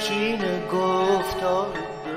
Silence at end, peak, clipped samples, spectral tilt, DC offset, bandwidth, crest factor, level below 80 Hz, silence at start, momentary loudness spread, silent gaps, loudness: 0 s; -10 dBFS; under 0.1%; -4.5 dB/octave; under 0.1%; 16 kHz; 14 dB; -50 dBFS; 0 s; 5 LU; none; -24 LUFS